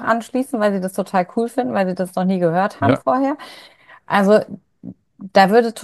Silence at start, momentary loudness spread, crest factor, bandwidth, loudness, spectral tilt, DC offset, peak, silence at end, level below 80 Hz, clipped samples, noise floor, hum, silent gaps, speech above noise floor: 0 s; 22 LU; 18 dB; 12.5 kHz; -18 LUFS; -6.5 dB/octave; under 0.1%; 0 dBFS; 0 s; -62 dBFS; under 0.1%; -39 dBFS; none; none; 21 dB